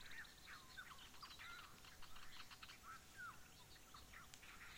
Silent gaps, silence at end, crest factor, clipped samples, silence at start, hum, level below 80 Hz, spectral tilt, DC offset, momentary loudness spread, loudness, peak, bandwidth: none; 0 s; 24 dB; under 0.1%; 0 s; none; -72 dBFS; -1.5 dB/octave; under 0.1%; 5 LU; -58 LUFS; -36 dBFS; 16.5 kHz